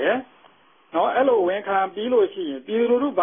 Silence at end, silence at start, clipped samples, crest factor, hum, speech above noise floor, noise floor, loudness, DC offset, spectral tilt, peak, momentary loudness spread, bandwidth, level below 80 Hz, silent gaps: 0 s; 0 s; under 0.1%; 14 dB; none; 34 dB; -55 dBFS; -22 LUFS; under 0.1%; -9.5 dB/octave; -8 dBFS; 8 LU; 3.7 kHz; -68 dBFS; none